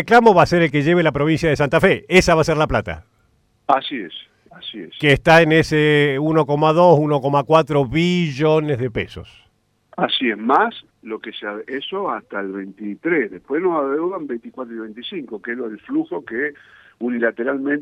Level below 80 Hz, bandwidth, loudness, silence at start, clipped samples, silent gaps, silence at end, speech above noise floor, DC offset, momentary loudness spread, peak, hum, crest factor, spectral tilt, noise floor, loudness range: -44 dBFS; 15.5 kHz; -17 LUFS; 0 s; under 0.1%; none; 0 s; 43 dB; under 0.1%; 18 LU; -2 dBFS; none; 16 dB; -6 dB/octave; -61 dBFS; 9 LU